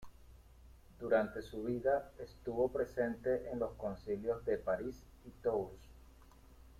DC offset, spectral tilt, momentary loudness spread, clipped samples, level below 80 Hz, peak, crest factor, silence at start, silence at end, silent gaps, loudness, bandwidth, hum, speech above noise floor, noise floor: under 0.1%; -7.5 dB/octave; 14 LU; under 0.1%; -60 dBFS; -20 dBFS; 20 dB; 0 s; 0.05 s; none; -38 LUFS; 15.5 kHz; none; 22 dB; -60 dBFS